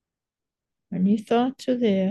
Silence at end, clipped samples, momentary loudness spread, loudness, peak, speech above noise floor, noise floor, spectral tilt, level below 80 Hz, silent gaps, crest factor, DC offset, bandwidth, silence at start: 0 s; under 0.1%; 4 LU; -23 LUFS; -10 dBFS; 66 dB; -88 dBFS; -7.5 dB/octave; -68 dBFS; none; 14 dB; under 0.1%; 11.5 kHz; 0.9 s